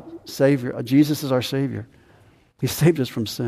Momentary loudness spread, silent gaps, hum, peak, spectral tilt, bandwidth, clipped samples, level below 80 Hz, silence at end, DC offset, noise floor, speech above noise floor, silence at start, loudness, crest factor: 10 LU; none; none; -6 dBFS; -6 dB/octave; 15.5 kHz; under 0.1%; -56 dBFS; 0 s; under 0.1%; -54 dBFS; 33 dB; 0 s; -21 LUFS; 16 dB